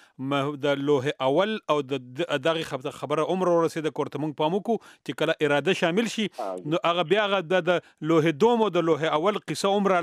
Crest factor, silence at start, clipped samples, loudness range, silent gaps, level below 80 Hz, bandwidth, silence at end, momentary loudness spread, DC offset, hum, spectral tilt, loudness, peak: 16 dB; 0.2 s; under 0.1%; 3 LU; none; -74 dBFS; 14.5 kHz; 0 s; 7 LU; under 0.1%; none; -5.5 dB/octave; -25 LUFS; -10 dBFS